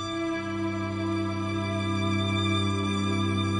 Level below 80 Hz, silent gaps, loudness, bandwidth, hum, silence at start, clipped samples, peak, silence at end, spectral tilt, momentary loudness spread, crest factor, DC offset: -56 dBFS; none; -28 LUFS; 11 kHz; none; 0 s; under 0.1%; -14 dBFS; 0 s; -6 dB/octave; 4 LU; 12 dB; under 0.1%